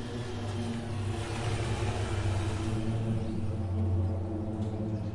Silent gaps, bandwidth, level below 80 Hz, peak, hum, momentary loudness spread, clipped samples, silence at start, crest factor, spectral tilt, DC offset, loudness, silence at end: none; 11.5 kHz; -44 dBFS; -18 dBFS; none; 4 LU; under 0.1%; 0 s; 12 dB; -6.5 dB/octave; under 0.1%; -33 LUFS; 0 s